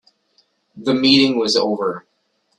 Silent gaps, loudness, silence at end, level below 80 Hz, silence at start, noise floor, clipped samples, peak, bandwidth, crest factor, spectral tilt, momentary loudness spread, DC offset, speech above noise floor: none; -16 LUFS; 0.6 s; -62 dBFS; 0.75 s; -67 dBFS; under 0.1%; 0 dBFS; 10.5 kHz; 18 dB; -4 dB/octave; 13 LU; under 0.1%; 50 dB